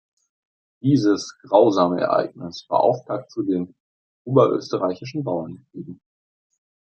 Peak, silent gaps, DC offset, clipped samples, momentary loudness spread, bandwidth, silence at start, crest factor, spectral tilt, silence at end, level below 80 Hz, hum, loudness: -2 dBFS; 3.80-4.25 s; under 0.1%; under 0.1%; 18 LU; 8.4 kHz; 0.85 s; 20 dB; -7 dB/octave; 0.9 s; -68 dBFS; none; -21 LUFS